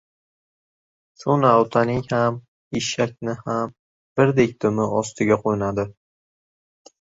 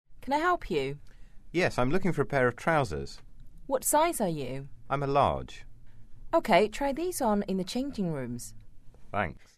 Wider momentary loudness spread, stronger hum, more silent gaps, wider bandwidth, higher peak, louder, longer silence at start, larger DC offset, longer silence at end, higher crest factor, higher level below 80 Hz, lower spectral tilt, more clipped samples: about the same, 13 LU vs 14 LU; neither; first, 2.48-2.71 s, 3.79-4.16 s vs none; second, 8 kHz vs 13.5 kHz; first, -2 dBFS vs -10 dBFS; first, -21 LUFS vs -29 LUFS; first, 1.2 s vs 0.05 s; second, under 0.1% vs 0.4%; first, 1.1 s vs 0 s; about the same, 20 dB vs 20 dB; second, -54 dBFS vs -46 dBFS; about the same, -6 dB/octave vs -5 dB/octave; neither